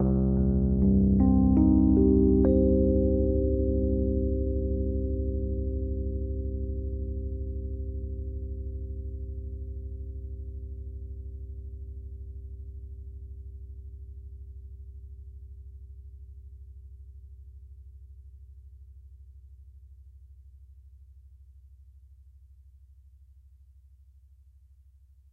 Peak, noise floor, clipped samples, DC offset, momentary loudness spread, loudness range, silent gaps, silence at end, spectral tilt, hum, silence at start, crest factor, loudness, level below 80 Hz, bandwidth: -10 dBFS; -57 dBFS; under 0.1%; under 0.1%; 27 LU; 27 LU; none; 3.2 s; -15 dB/octave; none; 0 s; 20 dB; -27 LUFS; -34 dBFS; 1.7 kHz